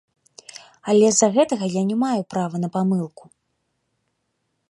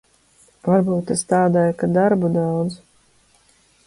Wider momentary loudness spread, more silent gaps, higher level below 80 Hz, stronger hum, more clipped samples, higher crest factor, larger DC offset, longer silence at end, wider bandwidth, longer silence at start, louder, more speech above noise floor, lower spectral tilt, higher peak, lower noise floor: first, 20 LU vs 9 LU; neither; second, -70 dBFS vs -56 dBFS; neither; neither; about the same, 20 dB vs 16 dB; neither; first, 1.65 s vs 1.1 s; about the same, 11.5 kHz vs 11.5 kHz; about the same, 0.55 s vs 0.65 s; about the same, -20 LUFS vs -19 LUFS; first, 54 dB vs 39 dB; second, -5 dB/octave vs -7 dB/octave; first, -2 dBFS vs -6 dBFS; first, -74 dBFS vs -57 dBFS